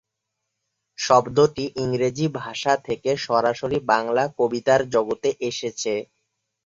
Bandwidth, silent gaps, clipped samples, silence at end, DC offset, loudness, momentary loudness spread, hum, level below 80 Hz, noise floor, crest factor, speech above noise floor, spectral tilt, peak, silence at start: 7.8 kHz; none; under 0.1%; 0.65 s; under 0.1%; -22 LUFS; 8 LU; none; -58 dBFS; -80 dBFS; 20 dB; 59 dB; -4.5 dB/octave; -2 dBFS; 1 s